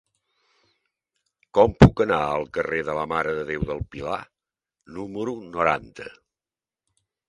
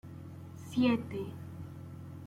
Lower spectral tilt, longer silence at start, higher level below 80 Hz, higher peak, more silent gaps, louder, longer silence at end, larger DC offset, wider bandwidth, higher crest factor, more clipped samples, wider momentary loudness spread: about the same, -7.5 dB/octave vs -7 dB/octave; first, 1.55 s vs 0.05 s; first, -40 dBFS vs -68 dBFS; first, 0 dBFS vs -18 dBFS; neither; first, -23 LUFS vs -34 LUFS; first, 1.2 s vs 0 s; neither; second, 11 kHz vs 15 kHz; first, 24 dB vs 18 dB; neither; about the same, 20 LU vs 18 LU